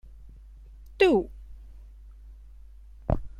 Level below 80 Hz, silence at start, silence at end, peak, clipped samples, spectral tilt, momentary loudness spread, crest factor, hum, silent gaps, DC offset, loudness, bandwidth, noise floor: -42 dBFS; 0.15 s; 0.1 s; -8 dBFS; under 0.1%; -7 dB/octave; 28 LU; 22 dB; none; none; under 0.1%; -25 LUFS; 10.5 kHz; -47 dBFS